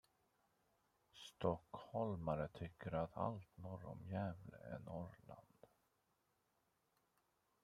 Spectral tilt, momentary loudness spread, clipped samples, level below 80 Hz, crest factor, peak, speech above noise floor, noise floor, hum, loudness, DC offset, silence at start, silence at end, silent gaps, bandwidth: -8 dB/octave; 16 LU; under 0.1%; -72 dBFS; 26 dB; -24 dBFS; 37 dB; -84 dBFS; none; -47 LUFS; under 0.1%; 1.15 s; 1.95 s; none; 14.5 kHz